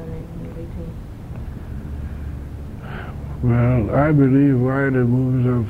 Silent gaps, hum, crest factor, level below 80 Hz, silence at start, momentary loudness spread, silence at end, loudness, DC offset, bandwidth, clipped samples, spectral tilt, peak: none; none; 16 dB; -34 dBFS; 0 s; 18 LU; 0 s; -18 LUFS; under 0.1%; 4.3 kHz; under 0.1%; -10.5 dB/octave; -4 dBFS